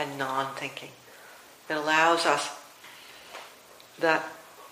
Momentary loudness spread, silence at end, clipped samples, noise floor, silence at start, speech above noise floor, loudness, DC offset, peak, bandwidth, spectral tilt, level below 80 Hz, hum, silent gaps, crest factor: 26 LU; 0 s; under 0.1%; -52 dBFS; 0 s; 25 dB; -27 LUFS; under 0.1%; -8 dBFS; 15.5 kHz; -2.5 dB/octave; -78 dBFS; none; none; 22 dB